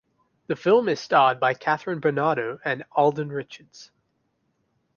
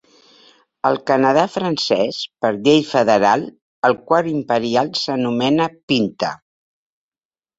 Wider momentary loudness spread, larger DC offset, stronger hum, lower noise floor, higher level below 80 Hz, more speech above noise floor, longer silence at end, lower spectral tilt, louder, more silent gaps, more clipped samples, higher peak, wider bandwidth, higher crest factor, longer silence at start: first, 13 LU vs 7 LU; neither; neither; second, -72 dBFS vs under -90 dBFS; second, -70 dBFS vs -60 dBFS; second, 49 dB vs over 73 dB; second, 1.1 s vs 1.25 s; about the same, -6 dB/octave vs -5 dB/octave; second, -23 LUFS vs -18 LUFS; second, none vs 3.62-3.82 s, 5.83-5.88 s; neither; second, -6 dBFS vs -2 dBFS; second, 7 kHz vs 8 kHz; about the same, 20 dB vs 18 dB; second, 0.5 s vs 0.85 s